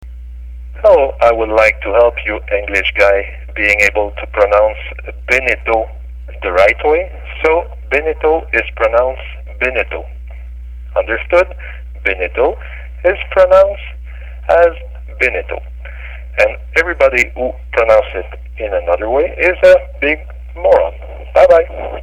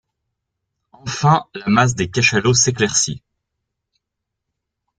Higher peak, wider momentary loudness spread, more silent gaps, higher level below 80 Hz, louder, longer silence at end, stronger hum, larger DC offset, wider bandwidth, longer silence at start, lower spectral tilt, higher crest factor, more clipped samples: about the same, 0 dBFS vs -2 dBFS; first, 20 LU vs 11 LU; neither; first, -28 dBFS vs -50 dBFS; first, -13 LUFS vs -16 LUFS; second, 0 s vs 1.8 s; first, 60 Hz at -30 dBFS vs none; neither; first, 11.5 kHz vs 10 kHz; second, 0 s vs 1.05 s; first, -5 dB/octave vs -3.5 dB/octave; about the same, 14 dB vs 18 dB; neither